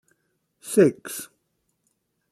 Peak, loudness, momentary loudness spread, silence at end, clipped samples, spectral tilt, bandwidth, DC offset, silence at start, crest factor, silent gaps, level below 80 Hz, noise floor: -6 dBFS; -21 LUFS; 23 LU; 1.05 s; under 0.1%; -5.5 dB/octave; 14 kHz; under 0.1%; 0.65 s; 22 dB; none; -72 dBFS; -74 dBFS